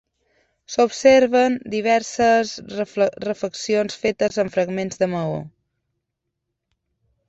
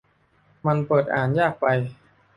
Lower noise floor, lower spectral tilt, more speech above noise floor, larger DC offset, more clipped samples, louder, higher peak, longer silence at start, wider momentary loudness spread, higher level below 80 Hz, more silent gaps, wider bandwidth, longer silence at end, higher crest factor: first, -79 dBFS vs -61 dBFS; second, -4.5 dB/octave vs -9 dB/octave; first, 60 dB vs 40 dB; neither; neither; about the same, -20 LUFS vs -22 LUFS; first, -2 dBFS vs -6 dBFS; about the same, 0.7 s vs 0.65 s; first, 13 LU vs 6 LU; about the same, -58 dBFS vs -60 dBFS; neither; second, 8.2 kHz vs 11 kHz; first, 1.8 s vs 0.45 s; about the same, 20 dB vs 18 dB